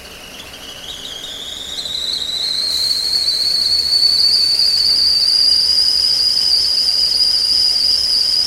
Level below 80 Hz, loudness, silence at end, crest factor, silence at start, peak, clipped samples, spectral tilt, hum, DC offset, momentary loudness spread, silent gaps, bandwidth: -46 dBFS; -11 LUFS; 0 s; 12 dB; 0 s; -4 dBFS; under 0.1%; 0.5 dB/octave; none; under 0.1%; 16 LU; none; 16 kHz